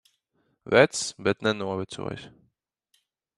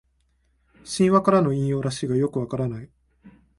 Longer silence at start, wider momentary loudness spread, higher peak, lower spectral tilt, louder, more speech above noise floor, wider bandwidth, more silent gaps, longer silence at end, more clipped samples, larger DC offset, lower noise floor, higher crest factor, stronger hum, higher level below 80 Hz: second, 0.65 s vs 0.85 s; first, 16 LU vs 12 LU; about the same, -4 dBFS vs -6 dBFS; second, -4 dB/octave vs -6.5 dB/octave; second, -25 LUFS vs -22 LUFS; about the same, 48 dB vs 45 dB; about the same, 12 kHz vs 11.5 kHz; neither; first, 1.1 s vs 0.3 s; neither; neither; first, -73 dBFS vs -66 dBFS; first, 24 dB vs 18 dB; neither; second, -64 dBFS vs -54 dBFS